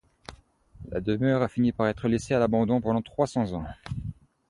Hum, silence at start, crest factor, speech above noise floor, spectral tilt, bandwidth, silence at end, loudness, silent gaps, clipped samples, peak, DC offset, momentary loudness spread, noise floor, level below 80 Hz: none; 0.3 s; 18 dB; 28 dB; -7.5 dB/octave; 11 kHz; 0.35 s; -27 LUFS; none; under 0.1%; -10 dBFS; under 0.1%; 14 LU; -54 dBFS; -48 dBFS